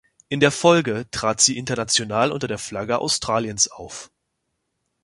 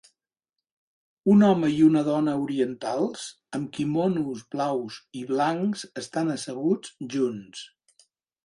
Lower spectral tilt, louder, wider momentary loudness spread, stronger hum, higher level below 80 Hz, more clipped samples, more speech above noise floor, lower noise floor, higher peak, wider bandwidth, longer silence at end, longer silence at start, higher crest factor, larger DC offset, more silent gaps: second, -3 dB/octave vs -6.5 dB/octave; first, -20 LUFS vs -25 LUFS; second, 11 LU vs 15 LU; neither; first, -54 dBFS vs -68 dBFS; neither; second, 54 dB vs 63 dB; second, -76 dBFS vs -88 dBFS; first, -2 dBFS vs -8 dBFS; about the same, 11.5 kHz vs 11.5 kHz; first, 1 s vs 0.8 s; second, 0.3 s vs 1.25 s; about the same, 20 dB vs 16 dB; neither; neither